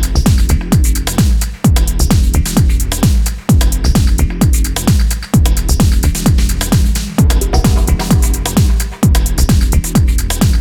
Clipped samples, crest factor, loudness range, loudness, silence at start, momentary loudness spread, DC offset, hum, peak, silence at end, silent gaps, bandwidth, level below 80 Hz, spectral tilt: under 0.1%; 10 dB; 0 LU; -13 LUFS; 0 s; 2 LU; under 0.1%; none; 0 dBFS; 0 s; none; 18.5 kHz; -12 dBFS; -5.5 dB/octave